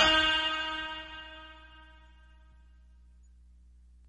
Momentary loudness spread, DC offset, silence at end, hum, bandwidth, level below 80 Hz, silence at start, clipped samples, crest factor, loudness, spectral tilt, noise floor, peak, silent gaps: 27 LU; under 0.1%; 2.25 s; 60 Hz at -55 dBFS; 11 kHz; -52 dBFS; 0 s; under 0.1%; 24 dB; -29 LUFS; -2 dB/octave; -57 dBFS; -8 dBFS; none